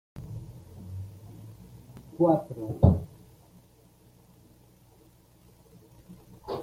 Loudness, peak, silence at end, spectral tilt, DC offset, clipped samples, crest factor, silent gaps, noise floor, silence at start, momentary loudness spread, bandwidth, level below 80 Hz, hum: -27 LUFS; -4 dBFS; 0 s; -10 dB/octave; under 0.1%; under 0.1%; 26 dB; none; -58 dBFS; 0.15 s; 26 LU; 15.5 kHz; -50 dBFS; none